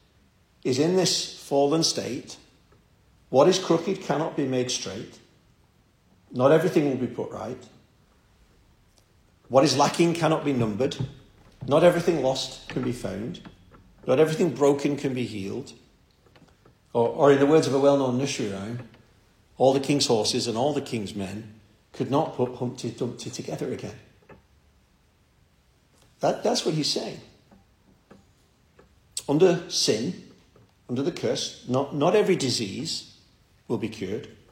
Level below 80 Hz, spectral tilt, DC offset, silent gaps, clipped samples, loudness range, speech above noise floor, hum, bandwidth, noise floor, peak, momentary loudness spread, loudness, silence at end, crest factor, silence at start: -60 dBFS; -5 dB/octave; under 0.1%; none; under 0.1%; 7 LU; 38 dB; none; 16.5 kHz; -62 dBFS; -4 dBFS; 16 LU; -25 LUFS; 0.2 s; 22 dB; 0.65 s